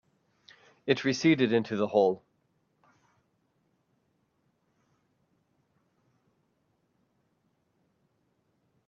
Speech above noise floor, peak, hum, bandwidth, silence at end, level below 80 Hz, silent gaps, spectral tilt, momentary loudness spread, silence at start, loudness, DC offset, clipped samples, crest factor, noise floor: 48 dB; -10 dBFS; none; 7.2 kHz; 6.7 s; -76 dBFS; none; -5.5 dB/octave; 10 LU; 0.85 s; -27 LUFS; under 0.1%; under 0.1%; 24 dB; -74 dBFS